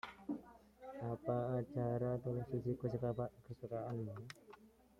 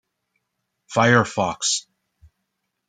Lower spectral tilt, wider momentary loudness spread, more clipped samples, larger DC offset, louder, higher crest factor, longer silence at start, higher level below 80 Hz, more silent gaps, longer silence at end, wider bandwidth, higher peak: first, -9 dB/octave vs -3.5 dB/octave; first, 17 LU vs 9 LU; neither; neither; second, -43 LUFS vs -20 LUFS; about the same, 18 dB vs 22 dB; second, 0.05 s vs 0.9 s; second, -68 dBFS vs -62 dBFS; neither; second, 0.3 s vs 1.1 s; about the same, 10 kHz vs 9.6 kHz; second, -24 dBFS vs -2 dBFS